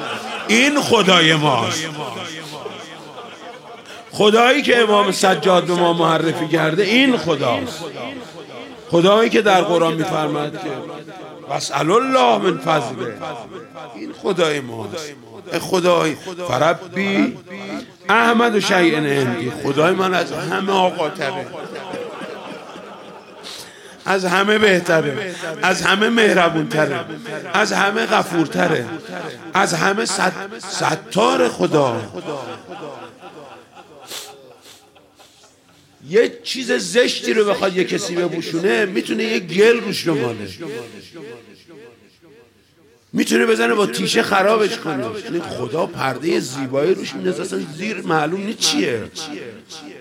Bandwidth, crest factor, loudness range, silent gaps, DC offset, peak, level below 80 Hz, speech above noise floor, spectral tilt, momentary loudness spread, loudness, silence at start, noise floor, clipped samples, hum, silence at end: 16.5 kHz; 18 dB; 7 LU; none; under 0.1%; 0 dBFS; -64 dBFS; 35 dB; -4 dB/octave; 20 LU; -17 LUFS; 0 s; -53 dBFS; under 0.1%; none; 0 s